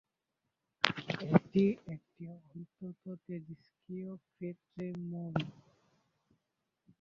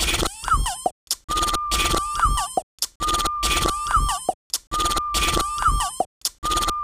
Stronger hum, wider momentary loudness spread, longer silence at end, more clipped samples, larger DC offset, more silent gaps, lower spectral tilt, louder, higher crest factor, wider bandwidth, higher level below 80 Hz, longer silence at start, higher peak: neither; first, 20 LU vs 6 LU; first, 1.5 s vs 0 s; neither; neither; second, none vs 0.91-1.07 s, 1.24-1.28 s, 2.63-2.78 s, 2.95-3.00 s, 4.34-4.50 s, 4.67-4.71 s, 6.06-6.21 s, 6.38-6.42 s; first, -5 dB/octave vs -2 dB/octave; second, -36 LUFS vs -22 LUFS; first, 36 dB vs 16 dB; second, 7.4 kHz vs 16 kHz; second, -72 dBFS vs -30 dBFS; first, 0.85 s vs 0 s; first, -2 dBFS vs -6 dBFS